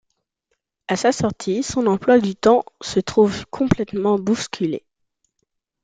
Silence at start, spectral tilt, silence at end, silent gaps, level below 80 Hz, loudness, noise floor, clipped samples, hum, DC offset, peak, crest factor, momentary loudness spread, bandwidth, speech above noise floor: 0.9 s; -5.5 dB/octave; 1.05 s; none; -48 dBFS; -20 LUFS; -75 dBFS; under 0.1%; none; under 0.1%; -2 dBFS; 18 dB; 9 LU; 9.4 kHz; 56 dB